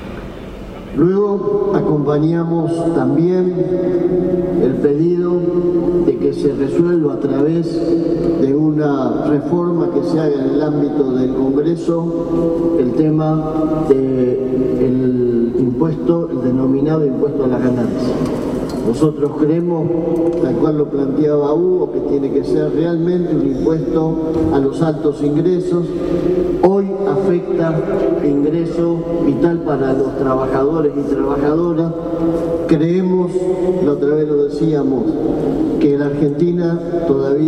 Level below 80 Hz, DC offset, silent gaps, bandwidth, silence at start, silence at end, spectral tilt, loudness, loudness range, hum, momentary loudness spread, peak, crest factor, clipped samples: -38 dBFS; under 0.1%; none; 9.6 kHz; 0 s; 0 s; -9 dB/octave; -16 LUFS; 1 LU; none; 3 LU; 0 dBFS; 14 dB; under 0.1%